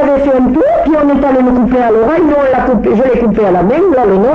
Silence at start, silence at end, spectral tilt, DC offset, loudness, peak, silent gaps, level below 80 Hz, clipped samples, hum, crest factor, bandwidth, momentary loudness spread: 0 s; 0 s; -9 dB/octave; under 0.1%; -9 LUFS; -2 dBFS; none; -30 dBFS; under 0.1%; none; 6 dB; 7.2 kHz; 1 LU